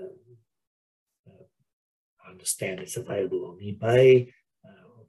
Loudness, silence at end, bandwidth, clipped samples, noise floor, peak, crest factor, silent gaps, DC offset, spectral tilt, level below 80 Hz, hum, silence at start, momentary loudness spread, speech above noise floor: -24 LUFS; 0.85 s; 12.5 kHz; under 0.1%; -59 dBFS; -8 dBFS; 20 dB; 0.67-1.07 s, 1.19-1.24 s, 1.73-2.17 s; under 0.1%; -5.5 dB/octave; -70 dBFS; none; 0 s; 19 LU; 36 dB